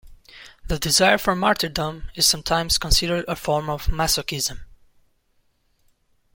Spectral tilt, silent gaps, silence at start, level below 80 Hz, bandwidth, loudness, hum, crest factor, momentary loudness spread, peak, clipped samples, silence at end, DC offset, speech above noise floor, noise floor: -2.5 dB/octave; none; 0.05 s; -34 dBFS; 17 kHz; -21 LUFS; none; 22 dB; 10 LU; -2 dBFS; under 0.1%; 1.7 s; under 0.1%; 43 dB; -65 dBFS